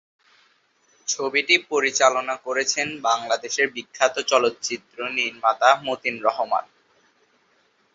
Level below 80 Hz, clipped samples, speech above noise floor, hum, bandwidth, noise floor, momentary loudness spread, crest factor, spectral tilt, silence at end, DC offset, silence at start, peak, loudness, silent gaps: -72 dBFS; under 0.1%; 41 dB; none; 7.8 kHz; -63 dBFS; 9 LU; 22 dB; -0.5 dB/octave; 1.3 s; under 0.1%; 1.05 s; -2 dBFS; -22 LUFS; none